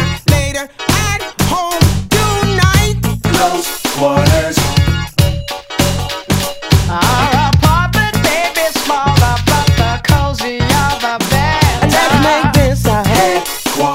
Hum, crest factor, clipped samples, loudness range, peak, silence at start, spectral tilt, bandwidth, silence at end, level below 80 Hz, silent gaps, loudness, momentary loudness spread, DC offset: none; 12 dB; 0.3%; 2 LU; 0 dBFS; 0 s; -4.5 dB/octave; 16.5 kHz; 0 s; -24 dBFS; none; -13 LUFS; 6 LU; under 0.1%